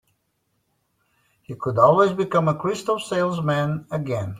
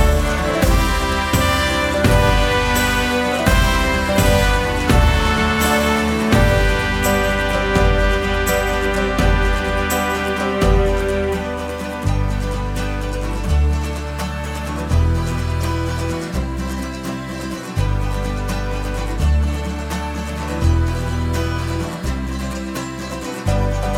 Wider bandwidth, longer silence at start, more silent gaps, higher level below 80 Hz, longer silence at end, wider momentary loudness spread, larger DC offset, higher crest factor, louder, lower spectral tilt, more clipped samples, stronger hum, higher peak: second, 14.5 kHz vs 17 kHz; first, 1.5 s vs 0 s; neither; second, -60 dBFS vs -22 dBFS; about the same, 0 s vs 0 s; about the same, 11 LU vs 9 LU; neither; about the same, 20 dB vs 16 dB; about the same, -21 LUFS vs -19 LUFS; first, -6.5 dB/octave vs -5 dB/octave; neither; neither; about the same, -2 dBFS vs 0 dBFS